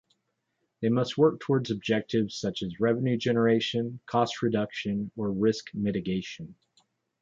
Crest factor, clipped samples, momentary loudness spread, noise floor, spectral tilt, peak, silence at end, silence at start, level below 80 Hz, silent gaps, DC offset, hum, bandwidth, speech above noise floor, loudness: 18 dB; under 0.1%; 8 LU; -78 dBFS; -6.5 dB/octave; -10 dBFS; 0.7 s; 0.8 s; -62 dBFS; none; under 0.1%; none; 7.8 kHz; 51 dB; -28 LUFS